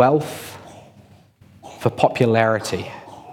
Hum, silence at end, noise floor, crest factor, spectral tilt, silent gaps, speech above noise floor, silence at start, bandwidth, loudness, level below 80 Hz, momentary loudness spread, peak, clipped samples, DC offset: none; 0 s; -50 dBFS; 20 dB; -6 dB/octave; none; 31 dB; 0 s; 17.5 kHz; -20 LUFS; -60 dBFS; 22 LU; -2 dBFS; under 0.1%; under 0.1%